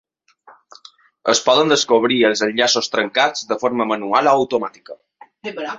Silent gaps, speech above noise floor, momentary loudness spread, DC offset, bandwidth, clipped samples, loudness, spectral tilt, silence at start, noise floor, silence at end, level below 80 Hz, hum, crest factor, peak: none; 33 dB; 11 LU; under 0.1%; 8 kHz; under 0.1%; -17 LUFS; -2.5 dB/octave; 1.25 s; -50 dBFS; 0 s; -62 dBFS; none; 18 dB; -2 dBFS